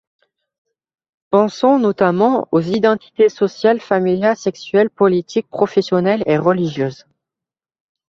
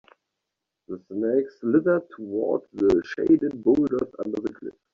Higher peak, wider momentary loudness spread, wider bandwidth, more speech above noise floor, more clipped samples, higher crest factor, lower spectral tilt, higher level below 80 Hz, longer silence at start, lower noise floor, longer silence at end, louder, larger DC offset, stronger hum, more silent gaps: first, -2 dBFS vs -8 dBFS; second, 5 LU vs 13 LU; about the same, 7.4 kHz vs 7 kHz; first, 73 dB vs 60 dB; neither; about the same, 16 dB vs 16 dB; about the same, -7 dB/octave vs -7.5 dB/octave; about the same, -60 dBFS vs -58 dBFS; first, 1.3 s vs 0.9 s; first, -88 dBFS vs -84 dBFS; first, 1.15 s vs 0.25 s; first, -16 LUFS vs -24 LUFS; neither; neither; neither